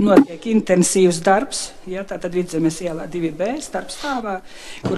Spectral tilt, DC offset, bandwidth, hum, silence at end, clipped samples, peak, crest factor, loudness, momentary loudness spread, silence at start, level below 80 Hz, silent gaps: -5 dB/octave; under 0.1%; 13.5 kHz; none; 0 s; under 0.1%; 0 dBFS; 18 dB; -20 LUFS; 14 LU; 0 s; -50 dBFS; none